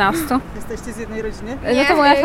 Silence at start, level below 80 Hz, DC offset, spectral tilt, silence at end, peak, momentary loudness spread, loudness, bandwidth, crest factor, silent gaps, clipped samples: 0 s; -36 dBFS; under 0.1%; -4.5 dB/octave; 0 s; 0 dBFS; 16 LU; -18 LUFS; 17 kHz; 18 dB; none; under 0.1%